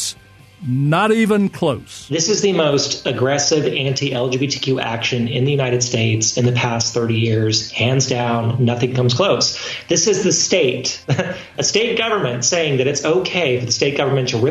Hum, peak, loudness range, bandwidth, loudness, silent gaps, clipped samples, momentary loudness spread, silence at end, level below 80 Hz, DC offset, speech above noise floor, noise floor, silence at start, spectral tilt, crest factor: none; -4 dBFS; 1 LU; 13 kHz; -17 LUFS; none; under 0.1%; 5 LU; 0 s; -54 dBFS; under 0.1%; 27 dB; -44 dBFS; 0 s; -4 dB/octave; 14 dB